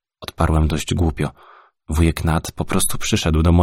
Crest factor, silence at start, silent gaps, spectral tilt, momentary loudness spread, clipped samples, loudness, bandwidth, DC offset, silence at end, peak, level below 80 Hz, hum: 16 dB; 0.2 s; none; -5.5 dB/octave; 9 LU; under 0.1%; -20 LUFS; 16 kHz; under 0.1%; 0 s; -2 dBFS; -26 dBFS; none